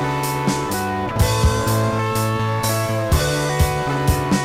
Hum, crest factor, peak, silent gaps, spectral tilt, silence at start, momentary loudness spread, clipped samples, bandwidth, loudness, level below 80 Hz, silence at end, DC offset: none; 12 dB; -6 dBFS; none; -5 dB/octave; 0 s; 3 LU; under 0.1%; 16.5 kHz; -20 LUFS; -28 dBFS; 0 s; under 0.1%